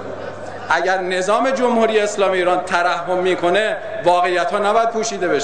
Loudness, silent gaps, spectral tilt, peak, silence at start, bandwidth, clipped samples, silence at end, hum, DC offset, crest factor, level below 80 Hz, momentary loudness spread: -17 LUFS; none; -3.5 dB/octave; -4 dBFS; 0 s; 10 kHz; under 0.1%; 0 s; none; 1%; 14 dB; -58 dBFS; 5 LU